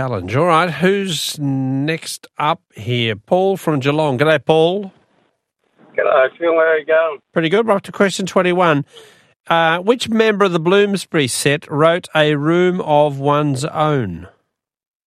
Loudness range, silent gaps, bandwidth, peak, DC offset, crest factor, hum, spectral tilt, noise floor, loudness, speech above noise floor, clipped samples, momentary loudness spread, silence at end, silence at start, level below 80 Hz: 3 LU; 9.36-9.44 s; 14.5 kHz; 0 dBFS; under 0.1%; 16 dB; none; -5 dB/octave; -67 dBFS; -16 LUFS; 51 dB; under 0.1%; 6 LU; 0.8 s; 0 s; -60 dBFS